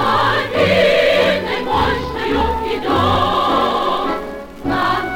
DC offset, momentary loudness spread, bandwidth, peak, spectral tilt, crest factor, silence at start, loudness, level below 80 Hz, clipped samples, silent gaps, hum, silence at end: under 0.1%; 8 LU; 17.5 kHz; -4 dBFS; -5.5 dB/octave; 12 dB; 0 s; -16 LUFS; -34 dBFS; under 0.1%; none; none; 0 s